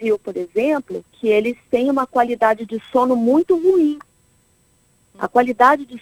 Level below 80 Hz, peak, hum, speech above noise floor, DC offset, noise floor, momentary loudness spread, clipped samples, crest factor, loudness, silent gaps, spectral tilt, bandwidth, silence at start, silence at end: -60 dBFS; 0 dBFS; none; 41 dB; under 0.1%; -59 dBFS; 9 LU; under 0.1%; 18 dB; -18 LUFS; none; -6 dB/octave; 16 kHz; 0 s; 0 s